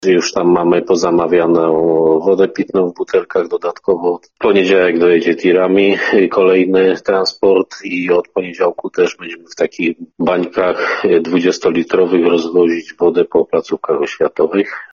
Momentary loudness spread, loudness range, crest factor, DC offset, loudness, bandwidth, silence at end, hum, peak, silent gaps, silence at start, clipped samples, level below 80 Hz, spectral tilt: 7 LU; 4 LU; 12 dB; under 0.1%; -14 LUFS; 7.2 kHz; 0.05 s; none; 0 dBFS; none; 0 s; under 0.1%; -54 dBFS; -5.5 dB/octave